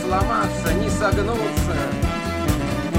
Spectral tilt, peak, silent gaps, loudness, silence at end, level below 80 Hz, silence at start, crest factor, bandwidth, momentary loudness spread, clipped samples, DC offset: -5.5 dB/octave; -6 dBFS; none; -22 LUFS; 0 s; -30 dBFS; 0 s; 14 dB; 16.5 kHz; 3 LU; under 0.1%; 0.4%